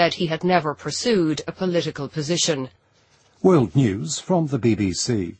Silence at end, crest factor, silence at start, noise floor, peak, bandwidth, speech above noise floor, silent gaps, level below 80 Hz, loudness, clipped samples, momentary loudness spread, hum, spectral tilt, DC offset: 0.05 s; 18 dB; 0 s; -59 dBFS; -4 dBFS; 8.8 kHz; 38 dB; none; -54 dBFS; -21 LUFS; under 0.1%; 9 LU; none; -5 dB/octave; under 0.1%